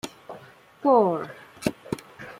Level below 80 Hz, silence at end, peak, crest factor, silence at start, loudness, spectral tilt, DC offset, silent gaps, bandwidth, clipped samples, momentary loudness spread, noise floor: -62 dBFS; 0.05 s; -6 dBFS; 20 dB; 0.05 s; -25 LUFS; -6 dB/octave; under 0.1%; none; 16 kHz; under 0.1%; 24 LU; -48 dBFS